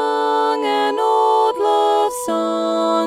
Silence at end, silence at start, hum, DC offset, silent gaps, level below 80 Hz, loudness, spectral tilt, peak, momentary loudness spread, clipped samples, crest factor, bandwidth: 0 s; 0 s; none; under 0.1%; none; -64 dBFS; -17 LUFS; -3 dB/octave; -6 dBFS; 4 LU; under 0.1%; 12 dB; 15.5 kHz